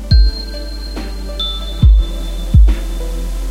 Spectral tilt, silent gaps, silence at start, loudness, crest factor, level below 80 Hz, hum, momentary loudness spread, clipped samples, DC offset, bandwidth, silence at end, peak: -6 dB/octave; none; 0 s; -17 LUFS; 14 dB; -14 dBFS; none; 13 LU; under 0.1%; under 0.1%; 11.5 kHz; 0 s; 0 dBFS